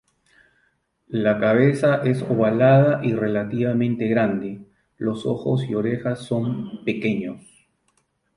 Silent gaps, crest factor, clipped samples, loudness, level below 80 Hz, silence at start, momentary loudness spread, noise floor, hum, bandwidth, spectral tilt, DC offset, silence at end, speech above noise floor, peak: none; 18 dB; under 0.1%; -21 LUFS; -60 dBFS; 1.1 s; 12 LU; -68 dBFS; none; 11 kHz; -8.5 dB/octave; under 0.1%; 1 s; 47 dB; -4 dBFS